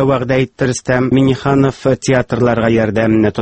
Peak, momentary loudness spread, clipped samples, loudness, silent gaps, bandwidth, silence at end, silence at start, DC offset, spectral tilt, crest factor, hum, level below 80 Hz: 0 dBFS; 4 LU; under 0.1%; -14 LUFS; none; 8.8 kHz; 0 s; 0 s; under 0.1%; -6.5 dB/octave; 12 dB; none; -40 dBFS